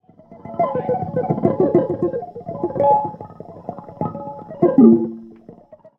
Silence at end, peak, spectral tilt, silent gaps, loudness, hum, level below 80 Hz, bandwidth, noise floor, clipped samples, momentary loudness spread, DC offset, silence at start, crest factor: 0.25 s; 0 dBFS; -12 dB/octave; none; -18 LUFS; none; -58 dBFS; 3.3 kHz; -44 dBFS; under 0.1%; 22 LU; under 0.1%; 0.3 s; 18 dB